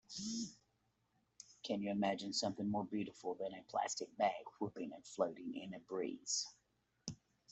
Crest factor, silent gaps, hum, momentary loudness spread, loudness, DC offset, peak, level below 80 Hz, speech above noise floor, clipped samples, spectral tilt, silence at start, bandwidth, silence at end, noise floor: 22 dB; none; none; 13 LU; -42 LUFS; under 0.1%; -22 dBFS; -80 dBFS; 39 dB; under 0.1%; -3.5 dB/octave; 0.1 s; 8.2 kHz; 0.35 s; -81 dBFS